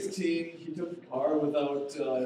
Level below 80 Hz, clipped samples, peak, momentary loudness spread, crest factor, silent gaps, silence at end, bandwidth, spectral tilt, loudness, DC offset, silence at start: -82 dBFS; under 0.1%; -16 dBFS; 10 LU; 14 dB; none; 0 s; 14 kHz; -5.5 dB/octave; -32 LUFS; under 0.1%; 0 s